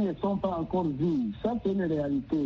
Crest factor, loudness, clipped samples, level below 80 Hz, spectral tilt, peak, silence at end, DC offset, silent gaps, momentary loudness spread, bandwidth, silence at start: 12 dB; -29 LUFS; under 0.1%; -52 dBFS; -8 dB/octave; -16 dBFS; 0 s; under 0.1%; none; 2 LU; 6.6 kHz; 0 s